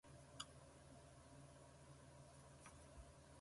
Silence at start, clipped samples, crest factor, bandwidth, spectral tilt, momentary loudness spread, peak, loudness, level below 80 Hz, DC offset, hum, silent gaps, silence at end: 0.05 s; under 0.1%; 28 dB; 11.5 kHz; -3.5 dB/octave; 7 LU; -34 dBFS; -62 LUFS; -72 dBFS; under 0.1%; none; none; 0 s